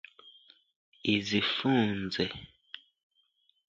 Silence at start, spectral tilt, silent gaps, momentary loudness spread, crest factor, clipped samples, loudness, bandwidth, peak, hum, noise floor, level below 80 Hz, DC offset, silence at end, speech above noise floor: 0.25 s; -5.5 dB/octave; 0.76-0.92 s; 21 LU; 20 dB; under 0.1%; -30 LUFS; 7.6 kHz; -12 dBFS; none; -72 dBFS; -62 dBFS; under 0.1%; 0.9 s; 43 dB